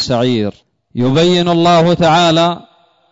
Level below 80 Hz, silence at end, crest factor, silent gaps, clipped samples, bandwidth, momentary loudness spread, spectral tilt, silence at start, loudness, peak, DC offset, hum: -44 dBFS; 0.55 s; 10 dB; none; under 0.1%; 7.8 kHz; 11 LU; -6 dB/octave; 0 s; -12 LUFS; -4 dBFS; under 0.1%; none